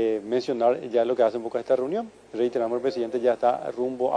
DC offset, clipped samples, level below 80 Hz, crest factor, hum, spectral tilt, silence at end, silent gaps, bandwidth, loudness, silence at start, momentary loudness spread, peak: under 0.1%; under 0.1%; -68 dBFS; 16 dB; none; -6 dB/octave; 0 s; none; 9.8 kHz; -25 LUFS; 0 s; 7 LU; -8 dBFS